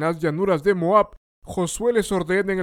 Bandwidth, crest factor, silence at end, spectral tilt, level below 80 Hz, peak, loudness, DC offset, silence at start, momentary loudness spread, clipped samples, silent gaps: 16.5 kHz; 16 dB; 0 s; -5.5 dB/octave; -48 dBFS; -4 dBFS; -21 LUFS; under 0.1%; 0 s; 9 LU; under 0.1%; 1.17-1.42 s